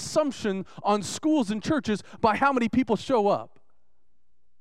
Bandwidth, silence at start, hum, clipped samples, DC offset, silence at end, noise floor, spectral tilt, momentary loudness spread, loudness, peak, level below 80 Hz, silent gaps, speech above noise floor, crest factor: 13.5 kHz; 0 s; none; under 0.1%; 0.4%; 1.15 s; -77 dBFS; -5 dB/octave; 7 LU; -26 LUFS; -8 dBFS; -58 dBFS; none; 52 dB; 18 dB